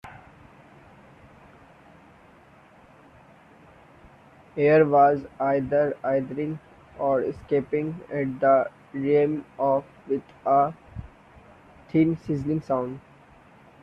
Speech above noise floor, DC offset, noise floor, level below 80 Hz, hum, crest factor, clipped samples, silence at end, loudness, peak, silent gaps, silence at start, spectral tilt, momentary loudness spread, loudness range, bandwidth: 30 dB; under 0.1%; -53 dBFS; -58 dBFS; none; 20 dB; under 0.1%; 0.85 s; -24 LUFS; -8 dBFS; none; 0.05 s; -9.5 dB/octave; 13 LU; 4 LU; 6.2 kHz